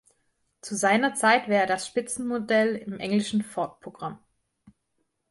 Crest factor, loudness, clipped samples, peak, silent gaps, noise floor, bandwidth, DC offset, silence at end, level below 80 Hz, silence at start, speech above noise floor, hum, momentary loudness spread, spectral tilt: 20 dB; -25 LUFS; under 0.1%; -8 dBFS; none; -76 dBFS; 11.5 kHz; under 0.1%; 1.15 s; -68 dBFS; 0.65 s; 51 dB; none; 16 LU; -4 dB/octave